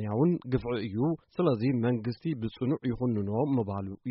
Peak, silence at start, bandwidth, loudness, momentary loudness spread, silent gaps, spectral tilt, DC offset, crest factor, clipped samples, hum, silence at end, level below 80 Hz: -14 dBFS; 0 s; 5.8 kHz; -30 LUFS; 6 LU; none; -8 dB/octave; under 0.1%; 16 dB; under 0.1%; none; 0 s; -56 dBFS